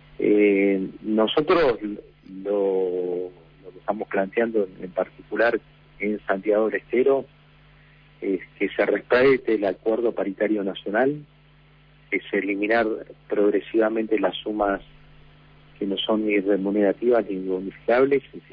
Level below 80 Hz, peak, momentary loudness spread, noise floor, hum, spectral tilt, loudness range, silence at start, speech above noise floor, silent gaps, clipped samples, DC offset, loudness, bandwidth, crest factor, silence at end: -56 dBFS; -8 dBFS; 11 LU; -54 dBFS; 50 Hz at -55 dBFS; -8.5 dB/octave; 3 LU; 0.2 s; 31 dB; none; under 0.1%; under 0.1%; -23 LUFS; 5.2 kHz; 16 dB; 0.15 s